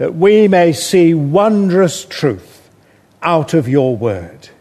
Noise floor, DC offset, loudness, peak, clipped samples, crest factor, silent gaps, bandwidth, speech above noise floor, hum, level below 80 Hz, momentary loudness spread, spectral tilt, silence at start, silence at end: -49 dBFS; under 0.1%; -13 LUFS; 0 dBFS; under 0.1%; 12 dB; none; 13.5 kHz; 37 dB; none; -54 dBFS; 10 LU; -6 dB/octave; 0 s; 0.3 s